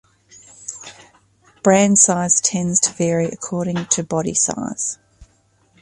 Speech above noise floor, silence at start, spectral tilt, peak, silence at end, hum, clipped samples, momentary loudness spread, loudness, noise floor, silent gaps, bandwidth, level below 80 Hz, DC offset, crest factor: 41 dB; 0.6 s; -3.5 dB/octave; 0 dBFS; 0.55 s; none; under 0.1%; 20 LU; -17 LUFS; -59 dBFS; none; 11.5 kHz; -56 dBFS; under 0.1%; 20 dB